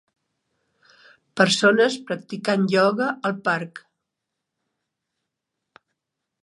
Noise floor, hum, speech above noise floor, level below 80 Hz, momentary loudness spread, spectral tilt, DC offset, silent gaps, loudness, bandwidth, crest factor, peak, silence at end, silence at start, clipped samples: -82 dBFS; none; 61 dB; -76 dBFS; 13 LU; -4.5 dB/octave; under 0.1%; none; -21 LUFS; 11.5 kHz; 22 dB; -2 dBFS; 2.65 s; 1.35 s; under 0.1%